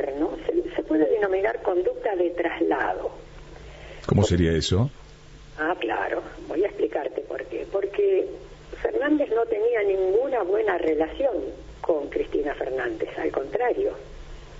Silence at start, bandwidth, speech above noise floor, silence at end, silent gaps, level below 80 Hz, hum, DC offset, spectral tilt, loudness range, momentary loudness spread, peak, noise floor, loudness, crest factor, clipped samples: 0 s; 7.6 kHz; 22 dB; 0 s; none; -44 dBFS; none; under 0.1%; -5.5 dB/octave; 3 LU; 13 LU; -8 dBFS; -45 dBFS; -25 LUFS; 18 dB; under 0.1%